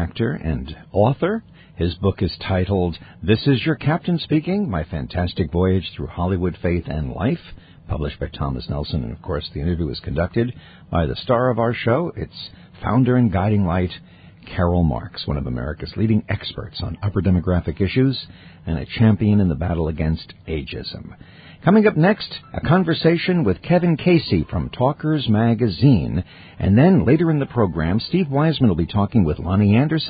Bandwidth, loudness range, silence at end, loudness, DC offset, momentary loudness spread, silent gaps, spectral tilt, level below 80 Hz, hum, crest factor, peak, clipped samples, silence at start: 5 kHz; 6 LU; 0 s; -20 LUFS; under 0.1%; 12 LU; none; -12.5 dB/octave; -34 dBFS; none; 18 dB; 0 dBFS; under 0.1%; 0 s